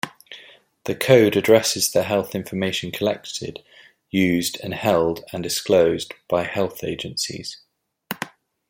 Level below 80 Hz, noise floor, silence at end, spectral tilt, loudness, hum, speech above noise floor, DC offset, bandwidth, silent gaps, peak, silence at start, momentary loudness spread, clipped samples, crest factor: -58 dBFS; -48 dBFS; 0.4 s; -4 dB/octave; -21 LUFS; none; 28 dB; under 0.1%; 16.5 kHz; none; -2 dBFS; 0.05 s; 18 LU; under 0.1%; 20 dB